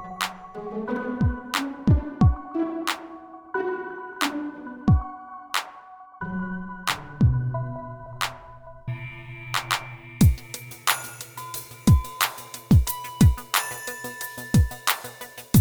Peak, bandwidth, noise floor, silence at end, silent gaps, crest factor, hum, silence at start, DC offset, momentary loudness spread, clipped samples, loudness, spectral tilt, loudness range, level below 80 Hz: -4 dBFS; over 20 kHz; -46 dBFS; 0 s; none; 22 dB; none; 0 s; under 0.1%; 17 LU; under 0.1%; -25 LUFS; -5 dB/octave; 5 LU; -34 dBFS